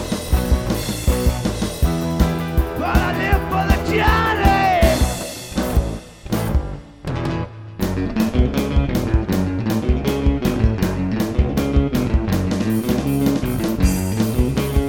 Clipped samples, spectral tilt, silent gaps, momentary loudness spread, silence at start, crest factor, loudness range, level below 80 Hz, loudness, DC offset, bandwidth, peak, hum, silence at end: under 0.1%; -6 dB/octave; none; 8 LU; 0 s; 18 dB; 4 LU; -24 dBFS; -20 LUFS; under 0.1%; 18 kHz; 0 dBFS; none; 0 s